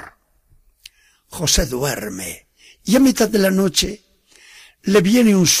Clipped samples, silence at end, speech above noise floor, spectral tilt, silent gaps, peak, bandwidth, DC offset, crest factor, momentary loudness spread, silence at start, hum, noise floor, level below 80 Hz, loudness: under 0.1%; 0 s; 40 dB; -4 dB/octave; none; -2 dBFS; 15.5 kHz; under 0.1%; 16 dB; 18 LU; 0 s; none; -56 dBFS; -36 dBFS; -16 LUFS